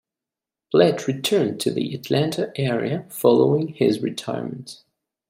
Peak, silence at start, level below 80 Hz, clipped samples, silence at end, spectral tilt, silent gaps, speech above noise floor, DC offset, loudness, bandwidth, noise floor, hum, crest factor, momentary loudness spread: -4 dBFS; 0.7 s; -66 dBFS; under 0.1%; 0.55 s; -6 dB/octave; none; 67 dB; under 0.1%; -21 LUFS; 16 kHz; -88 dBFS; none; 18 dB; 11 LU